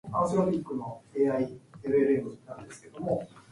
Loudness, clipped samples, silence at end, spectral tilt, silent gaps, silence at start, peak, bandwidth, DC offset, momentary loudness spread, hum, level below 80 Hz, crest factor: -29 LUFS; under 0.1%; 0.1 s; -8 dB/octave; none; 0.05 s; -12 dBFS; 11.5 kHz; under 0.1%; 18 LU; none; -62 dBFS; 18 dB